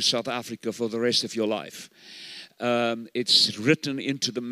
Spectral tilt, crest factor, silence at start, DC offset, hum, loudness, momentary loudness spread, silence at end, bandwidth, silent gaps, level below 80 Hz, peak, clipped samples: -3 dB/octave; 20 dB; 0 s; under 0.1%; none; -24 LUFS; 21 LU; 0 s; 16 kHz; none; -80 dBFS; -6 dBFS; under 0.1%